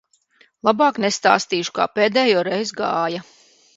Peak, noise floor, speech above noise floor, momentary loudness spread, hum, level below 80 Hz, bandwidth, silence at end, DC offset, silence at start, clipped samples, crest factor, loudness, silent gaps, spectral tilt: 0 dBFS; -58 dBFS; 39 dB; 6 LU; none; -68 dBFS; 8 kHz; 0.55 s; under 0.1%; 0.65 s; under 0.1%; 20 dB; -19 LUFS; none; -3.5 dB/octave